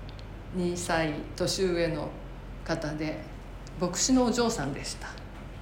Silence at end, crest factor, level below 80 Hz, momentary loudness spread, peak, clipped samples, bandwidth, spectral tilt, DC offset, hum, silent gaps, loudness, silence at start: 0 s; 18 dB; -44 dBFS; 19 LU; -12 dBFS; under 0.1%; 16.5 kHz; -4 dB/octave; under 0.1%; none; none; -29 LUFS; 0 s